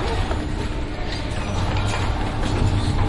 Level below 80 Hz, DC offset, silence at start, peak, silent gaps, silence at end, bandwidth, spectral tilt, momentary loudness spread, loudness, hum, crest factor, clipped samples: -26 dBFS; under 0.1%; 0 s; -8 dBFS; none; 0 s; 11.5 kHz; -6 dB/octave; 6 LU; -24 LUFS; none; 14 dB; under 0.1%